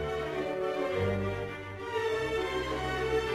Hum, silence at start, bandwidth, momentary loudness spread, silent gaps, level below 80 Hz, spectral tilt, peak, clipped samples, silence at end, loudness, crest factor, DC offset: none; 0 s; 15 kHz; 5 LU; none; -48 dBFS; -5.5 dB/octave; -18 dBFS; under 0.1%; 0 s; -32 LUFS; 14 dB; under 0.1%